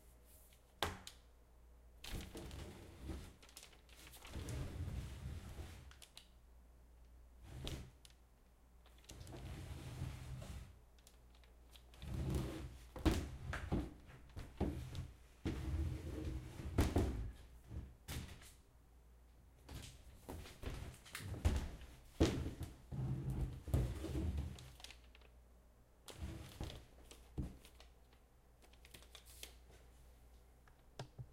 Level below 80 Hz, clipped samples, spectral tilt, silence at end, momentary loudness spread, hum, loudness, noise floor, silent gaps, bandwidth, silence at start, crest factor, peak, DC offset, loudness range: -52 dBFS; under 0.1%; -6 dB/octave; 0 s; 25 LU; none; -47 LUFS; -67 dBFS; none; 16 kHz; 0 s; 28 dB; -18 dBFS; under 0.1%; 13 LU